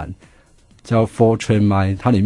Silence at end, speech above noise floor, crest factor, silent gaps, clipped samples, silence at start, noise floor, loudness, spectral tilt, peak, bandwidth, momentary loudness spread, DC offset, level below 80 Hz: 0 s; 35 dB; 16 dB; none; under 0.1%; 0 s; -50 dBFS; -17 LUFS; -7.5 dB/octave; 0 dBFS; 11.5 kHz; 5 LU; under 0.1%; -46 dBFS